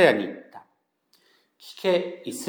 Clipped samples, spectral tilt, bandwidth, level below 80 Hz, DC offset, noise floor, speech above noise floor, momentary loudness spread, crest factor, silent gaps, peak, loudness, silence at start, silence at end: under 0.1%; -4.5 dB/octave; over 20 kHz; -86 dBFS; under 0.1%; -70 dBFS; 46 dB; 25 LU; 22 dB; none; -4 dBFS; -25 LUFS; 0 s; 0 s